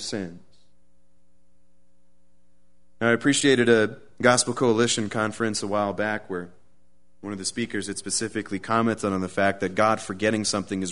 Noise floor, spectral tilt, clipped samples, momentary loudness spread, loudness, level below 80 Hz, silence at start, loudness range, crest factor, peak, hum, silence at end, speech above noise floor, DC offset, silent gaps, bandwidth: -68 dBFS; -3.5 dB/octave; under 0.1%; 11 LU; -24 LUFS; -62 dBFS; 0 s; 7 LU; 22 dB; -2 dBFS; none; 0 s; 44 dB; 0.5%; none; 11 kHz